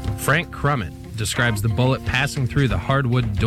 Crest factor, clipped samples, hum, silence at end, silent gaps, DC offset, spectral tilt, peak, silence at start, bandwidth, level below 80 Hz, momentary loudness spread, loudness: 16 dB; under 0.1%; none; 0 s; none; under 0.1%; -5.5 dB/octave; -6 dBFS; 0 s; 15.5 kHz; -34 dBFS; 5 LU; -21 LUFS